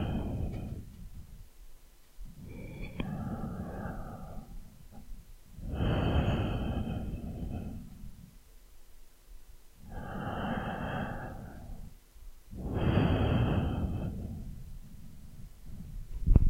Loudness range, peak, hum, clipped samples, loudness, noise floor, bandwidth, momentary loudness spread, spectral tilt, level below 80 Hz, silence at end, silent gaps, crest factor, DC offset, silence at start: 10 LU; -6 dBFS; none; under 0.1%; -35 LUFS; -54 dBFS; 16 kHz; 24 LU; -8 dB/octave; -38 dBFS; 0 s; none; 28 dB; under 0.1%; 0 s